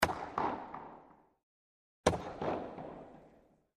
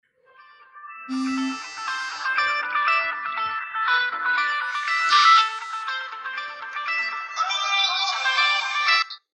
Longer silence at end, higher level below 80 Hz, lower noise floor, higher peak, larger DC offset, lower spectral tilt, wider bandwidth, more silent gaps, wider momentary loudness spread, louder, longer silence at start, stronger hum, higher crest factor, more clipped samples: first, 0.4 s vs 0.15 s; first, -58 dBFS vs -80 dBFS; first, -66 dBFS vs -53 dBFS; about the same, -8 dBFS vs -6 dBFS; neither; first, -4.5 dB/octave vs 0.5 dB/octave; first, 13 kHz vs 11 kHz; first, 1.43-2.04 s vs none; first, 21 LU vs 13 LU; second, -38 LUFS vs -22 LUFS; second, 0 s vs 0.75 s; neither; first, 30 dB vs 18 dB; neither